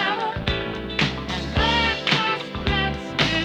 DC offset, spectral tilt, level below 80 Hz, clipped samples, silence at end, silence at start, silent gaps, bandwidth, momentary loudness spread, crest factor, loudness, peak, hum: under 0.1%; -4.5 dB/octave; -34 dBFS; under 0.1%; 0 s; 0 s; none; 13 kHz; 6 LU; 20 dB; -22 LUFS; -4 dBFS; none